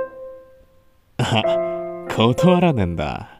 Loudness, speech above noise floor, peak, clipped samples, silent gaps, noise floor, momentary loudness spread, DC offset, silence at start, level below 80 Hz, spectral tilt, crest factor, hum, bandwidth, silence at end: -19 LUFS; 36 dB; -2 dBFS; under 0.1%; none; -54 dBFS; 18 LU; under 0.1%; 0 s; -44 dBFS; -6.5 dB/octave; 18 dB; none; 15.5 kHz; 0.1 s